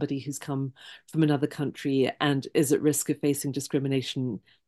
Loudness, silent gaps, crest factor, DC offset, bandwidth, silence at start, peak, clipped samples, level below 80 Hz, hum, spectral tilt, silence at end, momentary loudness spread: -27 LUFS; none; 18 dB; under 0.1%; 12.5 kHz; 0 s; -8 dBFS; under 0.1%; -72 dBFS; none; -5 dB/octave; 0.3 s; 9 LU